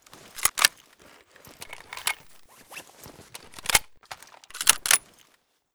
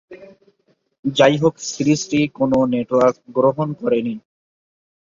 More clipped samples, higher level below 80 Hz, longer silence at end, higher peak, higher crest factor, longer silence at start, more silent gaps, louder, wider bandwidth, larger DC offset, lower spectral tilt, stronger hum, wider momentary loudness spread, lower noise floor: neither; about the same, -58 dBFS vs -58 dBFS; second, 0.75 s vs 0.95 s; about the same, 0 dBFS vs -2 dBFS; first, 30 dB vs 18 dB; first, 0.35 s vs 0.1 s; second, none vs 0.99-1.03 s; second, -23 LUFS vs -18 LUFS; first, over 20 kHz vs 7.6 kHz; neither; second, 1.5 dB/octave vs -5.5 dB/octave; neither; first, 23 LU vs 8 LU; about the same, -66 dBFS vs -64 dBFS